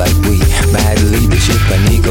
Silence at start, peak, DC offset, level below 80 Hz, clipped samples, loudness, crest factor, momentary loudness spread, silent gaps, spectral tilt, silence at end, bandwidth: 0 s; 0 dBFS; under 0.1%; -14 dBFS; under 0.1%; -11 LUFS; 10 dB; 1 LU; none; -5 dB/octave; 0 s; 18.5 kHz